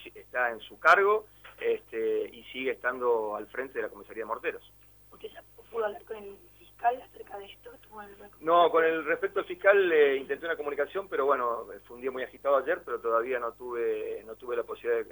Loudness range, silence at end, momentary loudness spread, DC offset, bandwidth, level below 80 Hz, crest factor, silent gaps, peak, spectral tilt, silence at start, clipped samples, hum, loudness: 11 LU; 0.05 s; 22 LU; under 0.1%; over 20 kHz; -66 dBFS; 22 dB; none; -8 dBFS; -4.5 dB/octave; 0 s; under 0.1%; 50 Hz at -65 dBFS; -29 LUFS